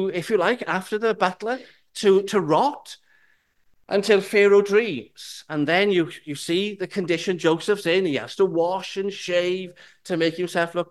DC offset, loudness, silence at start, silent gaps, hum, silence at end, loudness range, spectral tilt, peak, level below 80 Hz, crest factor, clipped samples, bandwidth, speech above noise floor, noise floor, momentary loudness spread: under 0.1%; -22 LUFS; 0 s; none; none; 0.05 s; 3 LU; -5 dB/octave; -4 dBFS; -70 dBFS; 18 dB; under 0.1%; 12.5 kHz; 41 dB; -63 dBFS; 12 LU